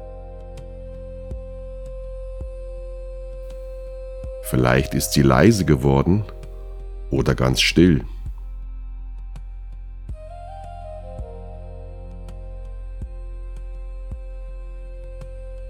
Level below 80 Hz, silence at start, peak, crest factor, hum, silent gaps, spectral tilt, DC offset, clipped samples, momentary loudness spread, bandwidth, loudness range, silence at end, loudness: -32 dBFS; 0 s; 0 dBFS; 22 dB; none; none; -5.5 dB/octave; under 0.1%; under 0.1%; 22 LU; 19.5 kHz; 18 LU; 0 s; -18 LUFS